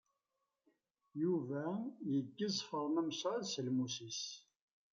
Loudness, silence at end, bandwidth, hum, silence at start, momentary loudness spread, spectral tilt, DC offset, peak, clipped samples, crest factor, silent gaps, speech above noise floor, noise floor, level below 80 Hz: -40 LUFS; 0.5 s; 7.6 kHz; none; 1.15 s; 6 LU; -5 dB/octave; under 0.1%; -26 dBFS; under 0.1%; 14 dB; none; 49 dB; -88 dBFS; -86 dBFS